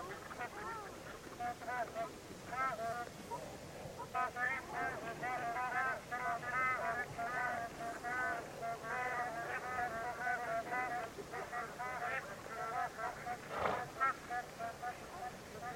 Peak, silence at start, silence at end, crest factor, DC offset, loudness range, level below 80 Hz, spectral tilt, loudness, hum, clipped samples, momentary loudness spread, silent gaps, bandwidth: -20 dBFS; 0 s; 0 s; 22 dB; under 0.1%; 4 LU; -66 dBFS; -4 dB/octave; -41 LUFS; none; under 0.1%; 10 LU; none; 16.5 kHz